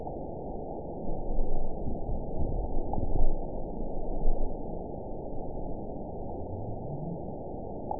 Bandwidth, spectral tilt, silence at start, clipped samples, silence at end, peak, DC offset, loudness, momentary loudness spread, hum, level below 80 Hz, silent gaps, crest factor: 1 kHz; -15.5 dB/octave; 0 s; under 0.1%; 0 s; -10 dBFS; 0.7%; -37 LUFS; 5 LU; none; -32 dBFS; none; 18 dB